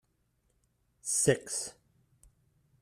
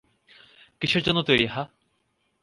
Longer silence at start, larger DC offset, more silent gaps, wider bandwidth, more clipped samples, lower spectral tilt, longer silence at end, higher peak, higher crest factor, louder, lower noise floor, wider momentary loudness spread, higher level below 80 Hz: first, 1.05 s vs 0.8 s; neither; neither; first, 15 kHz vs 11.5 kHz; neither; second, -3 dB/octave vs -5.5 dB/octave; first, 1.1 s vs 0.75 s; second, -12 dBFS vs -6 dBFS; about the same, 24 dB vs 22 dB; second, -30 LUFS vs -23 LUFS; about the same, -75 dBFS vs -72 dBFS; about the same, 15 LU vs 13 LU; second, -66 dBFS vs -54 dBFS